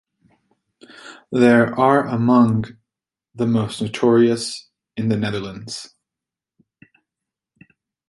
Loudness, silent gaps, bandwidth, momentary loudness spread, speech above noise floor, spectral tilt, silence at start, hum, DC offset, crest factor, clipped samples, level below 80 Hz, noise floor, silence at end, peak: -18 LUFS; none; 11.5 kHz; 18 LU; 70 dB; -6.5 dB/octave; 1.05 s; none; under 0.1%; 20 dB; under 0.1%; -58 dBFS; -87 dBFS; 2.25 s; -2 dBFS